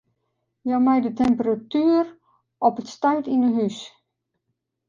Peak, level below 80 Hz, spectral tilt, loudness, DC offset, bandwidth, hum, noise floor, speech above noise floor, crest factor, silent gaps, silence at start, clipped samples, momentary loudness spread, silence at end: -6 dBFS; -58 dBFS; -6.5 dB/octave; -22 LUFS; under 0.1%; 7.4 kHz; none; -78 dBFS; 57 dB; 18 dB; none; 0.65 s; under 0.1%; 11 LU; 1 s